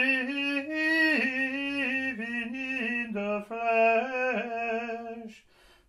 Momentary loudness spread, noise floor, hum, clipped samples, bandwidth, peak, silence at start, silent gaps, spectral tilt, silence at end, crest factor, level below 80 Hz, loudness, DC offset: 10 LU; -59 dBFS; none; under 0.1%; 13.5 kHz; -14 dBFS; 0 s; none; -4.5 dB/octave; 0.5 s; 16 dB; -70 dBFS; -28 LUFS; under 0.1%